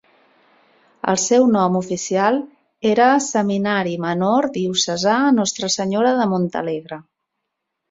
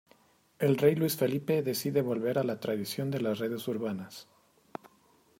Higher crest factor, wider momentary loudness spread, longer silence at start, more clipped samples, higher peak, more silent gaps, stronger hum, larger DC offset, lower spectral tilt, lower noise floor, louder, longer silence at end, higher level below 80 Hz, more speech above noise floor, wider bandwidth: about the same, 18 dB vs 20 dB; second, 10 LU vs 21 LU; first, 1.05 s vs 0.6 s; neither; first, -2 dBFS vs -12 dBFS; neither; neither; neither; second, -4 dB/octave vs -6 dB/octave; first, -78 dBFS vs -65 dBFS; first, -18 LUFS vs -30 LUFS; second, 0.9 s vs 1.15 s; first, -62 dBFS vs -74 dBFS; first, 60 dB vs 35 dB; second, 7.8 kHz vs 16 kHz